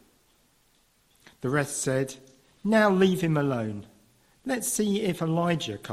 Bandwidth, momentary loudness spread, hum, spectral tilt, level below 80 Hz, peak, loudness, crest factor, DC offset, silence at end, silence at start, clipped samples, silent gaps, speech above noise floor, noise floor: 16 kHz; 14 LU; none; -5 dB/octave; -62 dBFS; -8 dBFS; -26 LUFS; 20 dB; under 0.1%; 0 s; 1.45 s; under 0.1%; none; 40 dB; -65 dBFS